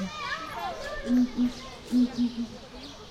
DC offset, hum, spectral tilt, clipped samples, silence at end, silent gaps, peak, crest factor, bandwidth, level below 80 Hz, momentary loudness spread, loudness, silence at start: under 0.1%; none; -5 dB/octave; under 0.1%; 0 s; none; -16 dBFS; 14 dB; 13 kHz; -50 dBFS; 16 LU; -29 LUFS; 0 s